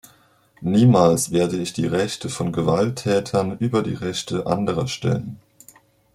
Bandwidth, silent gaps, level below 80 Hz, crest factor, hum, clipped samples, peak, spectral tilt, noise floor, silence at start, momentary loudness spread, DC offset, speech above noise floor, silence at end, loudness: 15 kHz; none; -52 dBFS; 18 dB; none; under 0.1%; -4 dBFS; -6 dB/octave; -56 dBFS; 0.6 s; 10 LU; under 0.1%; 36 dB; 0.8 s; -21 LUFS